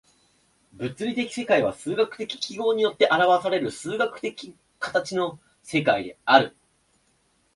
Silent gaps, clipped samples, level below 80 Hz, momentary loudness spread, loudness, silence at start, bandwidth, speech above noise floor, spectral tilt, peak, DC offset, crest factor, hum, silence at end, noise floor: none; under 0.1%; -66 dBFS; 14 LU; -24 LUFS; 0.8 s; 11.5 kHz; 43 dB; -4.5 dB/octave; -2 dBFS; under 0.1%; 24 dB; none; 1.05 s; -66 dBFS